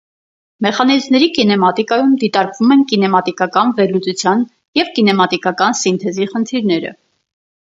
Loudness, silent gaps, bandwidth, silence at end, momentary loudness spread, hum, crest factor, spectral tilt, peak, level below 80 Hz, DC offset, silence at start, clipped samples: -14 LUFS; 4.68-4.73 s; 7.8 kHz; 0.85 s; 6 LU; none; 14 dB; -4.5 dB/octave; 0 dBFS; -62 dBFS; under 0.1%; 0.6 s; under 0.1%